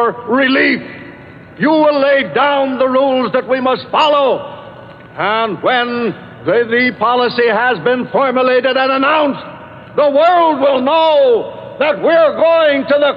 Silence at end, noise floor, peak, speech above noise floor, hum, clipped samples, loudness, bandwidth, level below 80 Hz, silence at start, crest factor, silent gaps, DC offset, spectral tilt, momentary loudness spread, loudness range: 0 s; -35 dBFS; -2 dBFS; 22 dB; none; under 0.1%; -13 LUFS; 7.2 kHz; -58 dBFS; 0 s; 10 dB; none; under 0.1%; -6.5 dB/octave; 10 LU; 3 LU